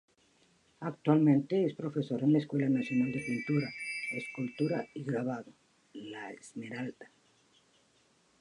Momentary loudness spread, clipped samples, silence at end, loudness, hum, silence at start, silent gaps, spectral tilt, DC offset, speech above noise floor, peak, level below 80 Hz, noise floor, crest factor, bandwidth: 17 LU; under 0.1%; 1.35 s; -32 LUFS; none; 0.8 s; none; -7.5 dB/octave; under 0.1%; 37 dB; -12 dBFS; -76 dBFS; -69 dBFS; 20 dB; 10.5 kHz